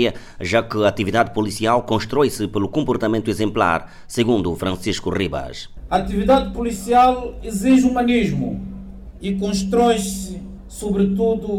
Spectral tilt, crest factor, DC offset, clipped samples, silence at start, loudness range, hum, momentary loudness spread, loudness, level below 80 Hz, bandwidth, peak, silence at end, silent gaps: -5.5 dB/octave; 16 dB; under 0.1%; under 0.1%; 0 s; 3 LU; none; 14 LU; -19 LUFS; -38 dBFS; 16 kHz; -2 dBFS; 0 s; none